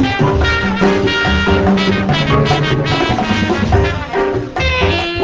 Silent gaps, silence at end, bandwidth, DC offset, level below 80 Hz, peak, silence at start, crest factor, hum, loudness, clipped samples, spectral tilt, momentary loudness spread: none; 0 s; 8 kHz; under 0.1%; -24 dBFS; -2 dBFS; 0 s; 12 dB; none; -14 LUFS; under 0.1%; -6 dB/octave; 4 LU